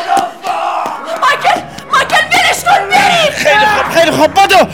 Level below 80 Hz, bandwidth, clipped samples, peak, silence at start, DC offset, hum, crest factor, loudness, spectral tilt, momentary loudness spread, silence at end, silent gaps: -46 dBFS; 18 kHz; 0.3%; 0 dBFS; 0 s; 0.7%; none; 10 dB; -10 LUFS; -2.5 dB/octave; 9 LU; 0 s; none